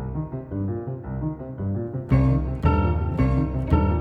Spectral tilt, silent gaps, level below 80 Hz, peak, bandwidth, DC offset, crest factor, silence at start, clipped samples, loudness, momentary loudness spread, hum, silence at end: -10.5 dB/octave; none; -30 dBFS; -6 dBFS; 4.9 kHz; under 0.1%; 16 dB; 0 s; under 0.1%; -24 LUFS; 10 LU; none; 0 s